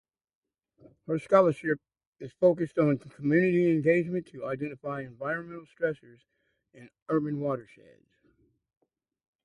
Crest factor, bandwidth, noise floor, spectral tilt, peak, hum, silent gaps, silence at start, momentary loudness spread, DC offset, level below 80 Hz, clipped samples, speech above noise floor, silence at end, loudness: 20 dB; 11 kHz; -69 dBFS; -9 dB/octave; -10 dBFS; none; 2.07-2.13 s, 7.02-7.06 s; 1.1 s; 14 LU; under 0.1%; -70 dBFS; under 0.1%; 41 dB; 1.8 s; -28 LUFS